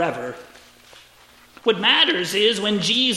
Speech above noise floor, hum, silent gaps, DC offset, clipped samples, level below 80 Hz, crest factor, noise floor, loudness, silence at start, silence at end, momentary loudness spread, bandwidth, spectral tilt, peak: 31 dB; 60 Hz at -60 dBFS; none; under 0.1%; under 0.1%; -64 dBFS; 18 dB; -51 dBFS; -18 LUFS; 0 s; 0 s; 17 LU; 16 kHz; -3 dB/octave; -4 dBFS